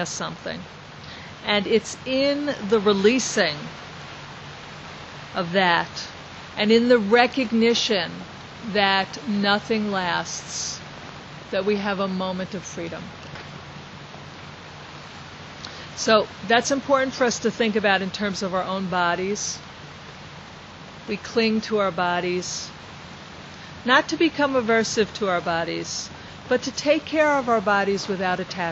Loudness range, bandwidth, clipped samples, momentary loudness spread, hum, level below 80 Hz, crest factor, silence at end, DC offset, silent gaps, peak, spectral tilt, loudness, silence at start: 8 LU; 8.2 kHz; under 0.1%; 20 LU; none; -56 dBFS; 22 dB; 0 s; under 0.1%; none; -2 dBFS; -3.5 dB/octave; -22 LUFS; 0 s